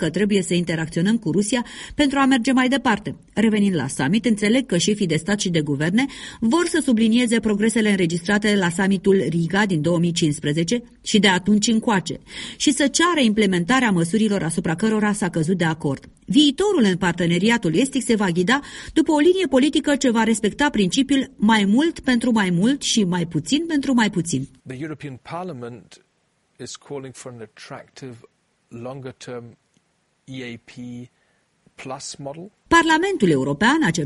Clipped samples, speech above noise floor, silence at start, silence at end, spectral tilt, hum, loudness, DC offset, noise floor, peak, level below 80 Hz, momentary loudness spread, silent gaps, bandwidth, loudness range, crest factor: under 0.1%; 47 dB; 0 s; 0 s; -4.5 dB/octave; none; -19 LUFS; under 0.1%; -67 dBFS; -2 dBFS; -50 dBFS; 18 LU; none; 11.5 kHz; 18 LU; 18 dB